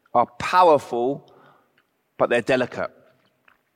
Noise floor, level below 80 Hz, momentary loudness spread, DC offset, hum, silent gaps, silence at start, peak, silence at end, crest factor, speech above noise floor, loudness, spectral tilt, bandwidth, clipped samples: -67 dBFS; -62 dBFS; 15 LU; under 0.1%; none; none; 0.15 s; -4 dBFS; 0.9 s; 18 dB; 47 dB; -21 LUFS; -5 dB/octave; 15.5 kHz; under 0.1%